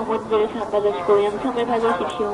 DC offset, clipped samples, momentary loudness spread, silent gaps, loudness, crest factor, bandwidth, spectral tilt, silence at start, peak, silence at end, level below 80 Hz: under 0.1%; under 0.1%; 4 LU; none; -21 LUFS; 16 dB; 11 kHz; -5.5 dB/octave; 0 s; -4 dBFS; 0 s; -52 dBFS